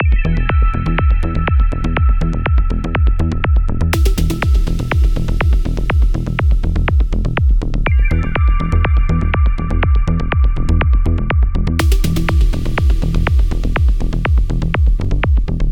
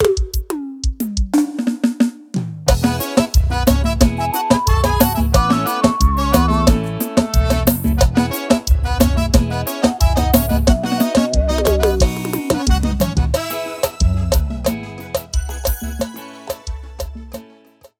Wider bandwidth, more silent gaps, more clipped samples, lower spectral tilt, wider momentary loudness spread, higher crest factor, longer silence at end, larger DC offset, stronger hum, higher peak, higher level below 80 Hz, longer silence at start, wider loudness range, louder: about the same, 16.5 kHz vs 18 kHz; neither; neither; first, -7 dB/octave vs -5.5 dB/octave; second, 2 LU vs 11 LU; about the same, 12 dB vs 16 dB; second, 0 s vs 0.55 s; neither; neither; about the same, -2 dBFS vs 0 dBFS; first, -14 dBFS vs -20 dBFS; about the same, 0 s vs 0 s; second, 1 LU vs 6 LU; about the same, -16 LUFS vs -17 LUFS